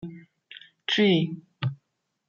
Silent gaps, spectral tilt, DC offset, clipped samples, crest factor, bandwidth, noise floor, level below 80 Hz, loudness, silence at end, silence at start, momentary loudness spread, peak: none; -6.5 dB/octave; under 0.1%; under 0.1%; 18 dB; 7.2 kHz; -77 dBFS; -68 dBFS; -26 LUFS; 0.55 s; 0 s; 25 LU; -10 dBFS